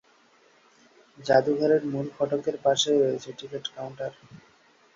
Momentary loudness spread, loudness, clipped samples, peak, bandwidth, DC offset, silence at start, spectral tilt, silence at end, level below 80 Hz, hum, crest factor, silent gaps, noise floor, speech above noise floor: 15 LU; -26 LUFS; under 0.1%; -6 dBFS; 7.6 kHz; under 0.1%; 1.2 s; -4.5 dB/octave; 0.6 s; -70 dBFS; none; 22 dB; none; -60 dBFS; 35 dB